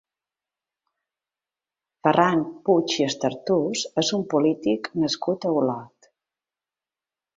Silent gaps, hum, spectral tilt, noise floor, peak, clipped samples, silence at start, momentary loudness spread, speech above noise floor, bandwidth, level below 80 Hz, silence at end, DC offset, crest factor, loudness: none; none; -4.5 dB/octave; under -90 dBFS; -2 dBFS; under 0.1%; 2.05 s; 6 LU; over 68 dB; 7.8 kHz; -68 dBFS; 1.5 s; under 0.1%; 22 dB; -23 LUFS